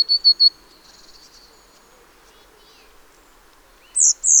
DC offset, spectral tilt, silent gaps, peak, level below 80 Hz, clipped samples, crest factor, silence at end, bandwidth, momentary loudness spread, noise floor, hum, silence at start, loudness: under 0.1%; 4.5 dB/octave; none; -4 dBFS; -58 dBFS; under 0.1%; 18 dB; 0 s; over 20 kHz; 5 LU; -51 dBFS; none; 0 s; -14 LUFS